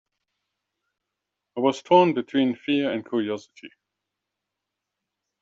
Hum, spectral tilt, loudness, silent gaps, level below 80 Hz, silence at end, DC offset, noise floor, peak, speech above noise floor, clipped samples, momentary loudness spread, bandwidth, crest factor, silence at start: none; -4 dB/octave; -23 LUFS; none; -72 dBFS; 1.75 s; under 0.1%; -84 dBFS; -4 dBFS; 62 dB; under 0.1%; 12 LU; 7.8 kHz; 22 dB; 1.55 s